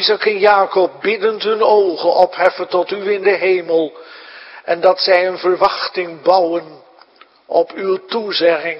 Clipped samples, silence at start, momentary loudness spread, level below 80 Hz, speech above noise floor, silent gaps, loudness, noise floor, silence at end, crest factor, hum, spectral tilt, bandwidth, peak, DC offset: under 0.1%; 0 s; 9 LU; -64 dBFS; 32 dB; none; -15 LUFS; -47 dBFS; 0 s; 16 dB; none; -6 dB/octave; 5.8 kHz; 0 dBFS; under 0.1%